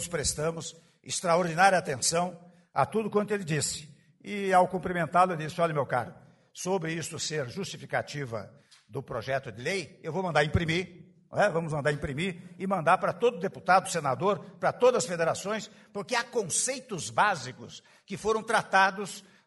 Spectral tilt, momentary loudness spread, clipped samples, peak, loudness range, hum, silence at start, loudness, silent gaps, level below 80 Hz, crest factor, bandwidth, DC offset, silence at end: -4 dB/octave; 14 LU; under 0.1%; -8 dBFS; 6 LU; none; 0 s; -28 LUFS; none; -56 dBFS; 22 dB; 11.5 kHz; under 0.1%; 0.25 s